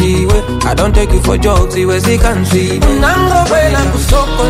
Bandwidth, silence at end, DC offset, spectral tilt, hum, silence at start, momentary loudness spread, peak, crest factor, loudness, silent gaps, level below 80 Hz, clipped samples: 16 kHz; 0 s; under 0.1%; -5.5 dB/octave; none; 0 s; 3 LU; 0 dBFS; 10 dB; -11 LUFS; none; -14 dBFS; under 0.1%